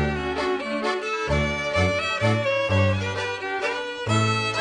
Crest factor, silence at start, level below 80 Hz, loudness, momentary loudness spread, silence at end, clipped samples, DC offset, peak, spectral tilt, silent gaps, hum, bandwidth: 14 dB; 0 s; -40 dBFS; -24 LUFS; 5 LU; 0 s; under 0.1%; under 0.1%; -8 dBFS; -5.5 dB/octave; none; none; 10 kHz